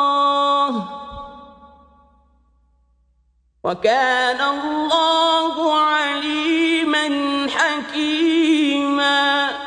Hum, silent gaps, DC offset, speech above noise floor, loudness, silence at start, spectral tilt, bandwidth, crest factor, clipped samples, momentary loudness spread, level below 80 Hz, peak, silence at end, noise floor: none; none; under 0.1%; 44 dB; -18 LUFS; 0 s; -3 dB/octave; 10 kHz; 16 dB; under 0.1%; 10 LU; -56 dBFS; -4 dBFS; 0 s; -61 dBFS